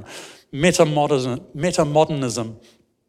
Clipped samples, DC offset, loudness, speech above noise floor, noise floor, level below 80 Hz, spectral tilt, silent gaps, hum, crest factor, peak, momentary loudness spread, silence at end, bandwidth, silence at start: under 0.1%; under 0.1%; -20 LUFS; 21 dB; -40 dBFS; -52 dBFS; -5 dB/octave; none; none; 18 dB; -2 dBFS; 17 LU; 0.5 s; 15 kHz; 0 s